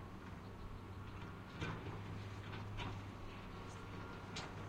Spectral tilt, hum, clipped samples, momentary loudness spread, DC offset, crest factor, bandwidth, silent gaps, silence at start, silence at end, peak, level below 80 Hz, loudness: -5.5 dB/octave; none; under 0.1%; 6 LU; under 0.1%; 16 dB; 16 kHz; none; 0 s; 0 s; -32 dBFS; -58 dBFS; -50 LUFS